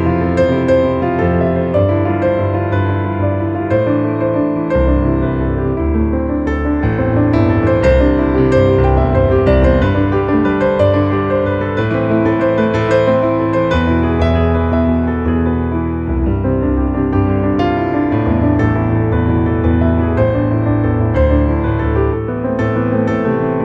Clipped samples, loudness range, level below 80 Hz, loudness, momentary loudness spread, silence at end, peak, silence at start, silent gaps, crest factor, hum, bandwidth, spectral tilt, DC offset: under 0.1%; 3 LU; -22 dBFS; -14 LUFS; 4 LU; 0 s; 0 dBFS; 0 s; none; 12 dB; none; 7.4 kHz; -9.5 dB/octave; under 0.1%